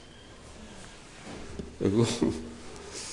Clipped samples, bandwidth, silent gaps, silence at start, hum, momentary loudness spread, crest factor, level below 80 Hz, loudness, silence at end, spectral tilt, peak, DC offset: under 0.1%; 11 kHz; none; 0 s; none; 22 LU; 20 dB; -52 dBFS; -30 LUFS; 0 s; -5.5 dB/octave; -12 dBFS; under 0.1%